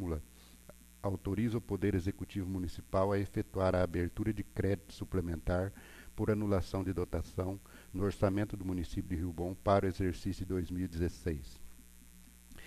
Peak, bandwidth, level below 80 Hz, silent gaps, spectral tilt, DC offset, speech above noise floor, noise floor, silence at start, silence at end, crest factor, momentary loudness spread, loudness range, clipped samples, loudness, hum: -16 dBFS; 14 kHz; -48 dBFS; none; -7.5 dB/octave; under 0.1%; 22 dB; -57 dBFS; 0 s; 0 s; 20 dB; 11 LU; 2 LU; under 0.1%; -36 LUFS; none